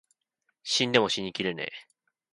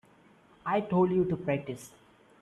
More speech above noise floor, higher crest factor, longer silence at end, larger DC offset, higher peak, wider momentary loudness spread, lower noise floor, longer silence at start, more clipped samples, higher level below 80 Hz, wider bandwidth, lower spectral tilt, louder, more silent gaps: first, 50 dB vs 31 dB; first, 24 dB vs 16 dB; about the same, 0.5 s vs 0.55 s; neither; first, -6 dBFS vs -14 dBFS; about the same, 17 LU vs 17 LU; first, -78 dBFS vs -60 dBFS; about the same, 0.65 s vs 0.65 s; neither; second, -70 dBFS vs -64 dBFS; about the same, 11.5 kHz vs 12.5 kHz; second, -3 dB/octave vs -7.5 dB/octave; about the same, -27 LUFS vs -29 LUFS; neither